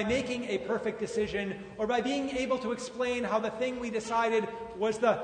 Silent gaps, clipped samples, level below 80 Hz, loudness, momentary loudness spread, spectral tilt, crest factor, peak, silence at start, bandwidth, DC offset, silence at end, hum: none; under 0.1%; -58 dBFS; -31 LUFS; 6 LU; -4.5 dB/octave; 18 dB; -12 dBFS; 0 s; 9.6 kHz; under 0.1%; 0 s; none